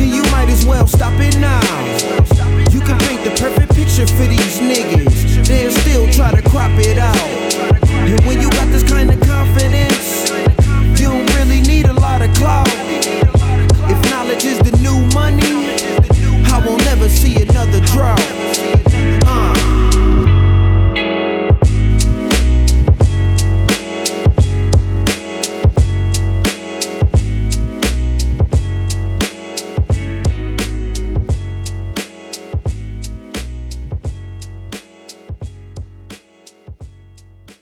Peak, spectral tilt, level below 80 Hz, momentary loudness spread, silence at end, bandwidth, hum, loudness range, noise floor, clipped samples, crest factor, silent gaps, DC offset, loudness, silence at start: 0 dBFS; -5.5 dB/octave; -16 dBFS; 13 LU; 0.75 s; 18 kHz; none; 11 LU; -46 dBFS; under 0.1%; 12 dB; none; under 0.1%; -13 LUFS; 0 s